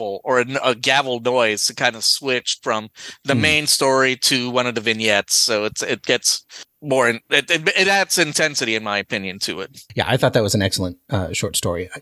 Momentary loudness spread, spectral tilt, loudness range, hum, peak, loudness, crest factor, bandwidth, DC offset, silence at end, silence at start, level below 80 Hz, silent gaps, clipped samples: 9 LU; -2.5 dB/octave; 3 LU; none; 0 dBFS; -18 LUFS; 18 dB; 16 kHz; under 0.1%; 0 s; 0 s; -48 dBFS; none; under 0.1%